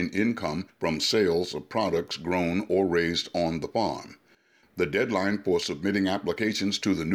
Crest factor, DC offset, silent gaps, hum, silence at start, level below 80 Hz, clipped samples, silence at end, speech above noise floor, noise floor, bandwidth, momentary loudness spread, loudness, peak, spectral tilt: 14 dB; under 0.1%; none; none; 0 s; -56 dBFS; under 0.1%; 0 s; 35 dB; -62 dBFS; 15 kHz; 7 LU; -27 LUFS; -12 dBFS; -4.5 dB/octave